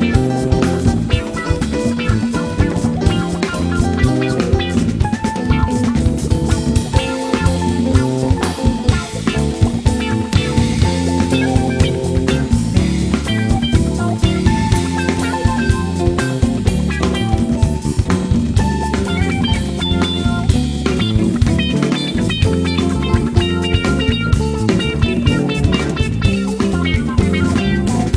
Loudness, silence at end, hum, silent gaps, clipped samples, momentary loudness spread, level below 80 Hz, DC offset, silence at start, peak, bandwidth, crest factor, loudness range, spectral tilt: -16 LUFS; 0 s; none; none; under 0.1%; 3 LU; -24 dBFS; under 0.1%; 0 s; 0 dBFS; 11 kHz; 14 dB; 1 LU; -6 dB/octave